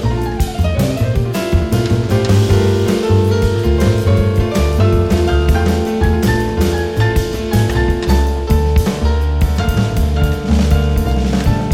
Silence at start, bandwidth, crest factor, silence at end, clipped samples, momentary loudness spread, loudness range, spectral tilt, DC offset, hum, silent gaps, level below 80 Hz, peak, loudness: 0 s; 16 kHz; 12 dB; 0 s; under 0.1%; 3 LU; 2 LU; -7 dB/octave; under 0.1%; none; none; -18 dBFS; 0 dBFS; -15 LUFS